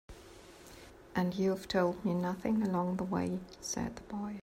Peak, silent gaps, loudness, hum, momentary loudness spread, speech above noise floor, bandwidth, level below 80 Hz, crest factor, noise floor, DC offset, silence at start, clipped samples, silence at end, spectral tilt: -18 dBFS; none; -35 LUFS; none; 21 LU; 20 dB; 16 kHz; -60 dBFS; 18 dB; -54 dBFS; under 0.1%; 0.1 s; under 0.1%; 0 s; -6 dB/octave